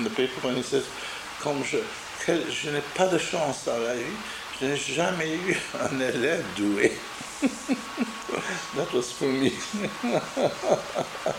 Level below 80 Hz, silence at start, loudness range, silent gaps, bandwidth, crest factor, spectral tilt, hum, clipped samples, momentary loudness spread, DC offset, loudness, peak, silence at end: -60 dBFS; 0 s; 1 LU; none; 16 kHz; 20 dB; -4 dB/octave; none; under 0.1%; 7 LU; under 0.1%; -28 LUFS; -6 dBFS; 0 s